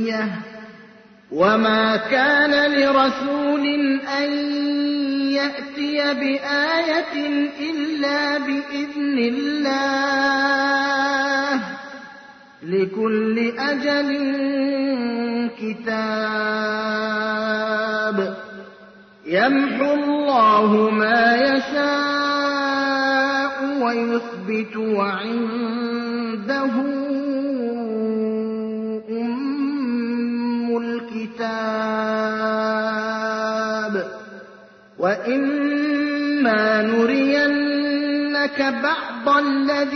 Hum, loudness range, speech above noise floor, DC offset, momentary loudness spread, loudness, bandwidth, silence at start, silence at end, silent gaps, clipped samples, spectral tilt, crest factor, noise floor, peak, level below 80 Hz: none; 6 LU; 27 dB; under 0.1%; 9 LU; -20 LUFS; 6.4 kHz; 0 s; 0 s; none; under 0.1%; -5 dB/octave; 16 dB; -47 dBFS; -4 dBFS; -64 dBFS